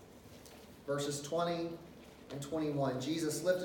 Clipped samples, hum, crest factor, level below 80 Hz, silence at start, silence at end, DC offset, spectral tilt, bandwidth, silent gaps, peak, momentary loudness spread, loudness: under 0.1%; none; 20 dB; -68 dBFS; 0 s; 0 s; under 0.1%; -5 dB/octave; 18 kHz; none; -18 dBFS; 19 LU; -37 LUFS